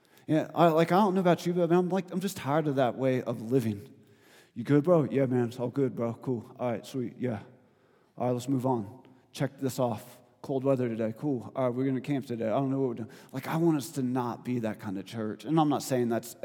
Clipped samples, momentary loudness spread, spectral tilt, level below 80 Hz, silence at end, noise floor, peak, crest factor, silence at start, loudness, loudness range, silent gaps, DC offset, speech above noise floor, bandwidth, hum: under 0.1%; 12 LU; -7 dB/octave; -80 dBFS; 0.1 s; -64 dBFS; -8 dBFS; 22 dB; 0.3 s; -29 LUFS; 6 LU; none; under 0.1%; 36 dB; 18.5 kHz; none